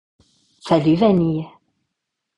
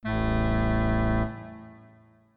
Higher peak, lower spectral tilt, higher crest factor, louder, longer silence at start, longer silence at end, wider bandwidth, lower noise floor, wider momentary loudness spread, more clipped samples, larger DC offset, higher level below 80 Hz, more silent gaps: first, -4 dBFS vs -14 dBFS; second, -8.5 dB/octave vs -11 dB/octave; about the same, 18 dB vs 14 dB; first, -18 LUFS vs -27 LUFS; first, 0.65 s vs 0.05 s; first, 0.9 s vs 0.6 s; first, 10.5 kHz vs 4.7 kHz; first, -79 dBFS vs -56 dBFS; first, 21 LU vs 17 LU; neither; neither; second, -54 dBFS vs -32 dBFS; neither